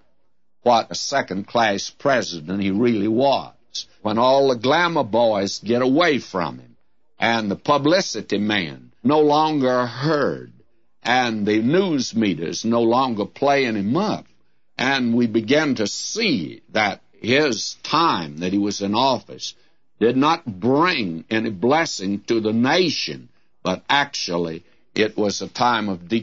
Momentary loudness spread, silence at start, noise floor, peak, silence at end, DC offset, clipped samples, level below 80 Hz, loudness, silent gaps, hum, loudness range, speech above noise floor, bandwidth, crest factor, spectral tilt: 9 LU; 0.65 s; -73 dBFS; -2 dBFS; 0 s; 0.2%; under 0.1%; -62 dBFS; -20 LUFS; none; none; 2 LU; 53 dB; 8 kHz; 18 dB; -4.5 dB/octave